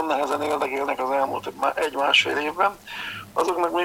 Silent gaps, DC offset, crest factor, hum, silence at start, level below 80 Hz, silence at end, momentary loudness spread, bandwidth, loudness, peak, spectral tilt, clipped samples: none; under 0.1%; 18 dB; none; 0 s; -60 dBFS; 0 s; 10 LU; 17 kHz; -23 LUFS; -6 dBFS; -2.5 dB/octave; under 0.1%